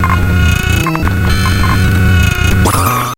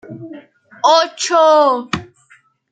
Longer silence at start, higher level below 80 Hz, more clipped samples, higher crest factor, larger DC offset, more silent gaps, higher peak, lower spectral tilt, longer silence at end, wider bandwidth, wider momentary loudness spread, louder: about the same, 0 s vs 0.1 s; first, -16 dBFS vs -58 dBFS; neither; second, 10 dB vs 16 dB; neither; neither; about the same, 0 dBFS vs 0 dBFS; first, -5 dB/octave vs -3 dB/octave; second, 0.05 s vs 0.7 s; first, 17.5 kHz vs 9.4 kHz; second, 3 LU vs 22 LU; first, -11 LUFS vs -14 LUFS